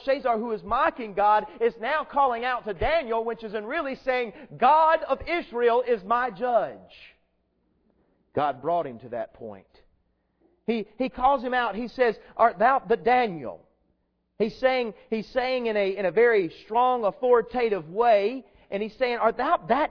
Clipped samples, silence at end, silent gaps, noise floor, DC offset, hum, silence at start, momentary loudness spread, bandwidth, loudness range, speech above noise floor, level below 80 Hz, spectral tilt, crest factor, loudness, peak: under 0.1%; 0 s; none; -72 dBFS; under 0.1%; none; 0 s; 11 LU; 5.4 kHz; 7 LU; 47 dB; -52 dBFS; -7 dB/octave; 20 dB; -25 LUFS; -6 dBFS